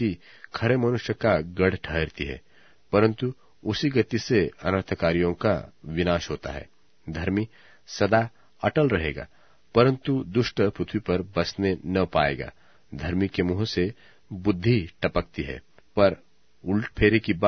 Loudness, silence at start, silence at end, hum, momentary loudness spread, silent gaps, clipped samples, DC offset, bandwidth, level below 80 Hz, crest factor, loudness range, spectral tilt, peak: -25 LUFS; 0 s; 0 s; none; 14 LU; none; under 0.1%; 0.2%; 6.6 kHz; -46 dBFS; 22 dB; 2 LU; -7 dB/octave; -4 dBFS